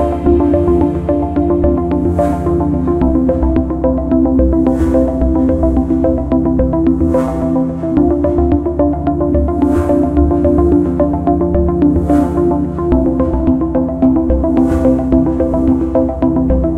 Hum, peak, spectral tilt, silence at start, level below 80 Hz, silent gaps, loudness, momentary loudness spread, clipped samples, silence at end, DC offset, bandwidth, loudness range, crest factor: none; 0 dBFS; -10.5 dB/octave; 0 s; -20 dBFS; none; -13 LUFS; 3 LU; under 0.1%; 0 s; under 0.1%; 9 kHz; 1 LU; 12 dB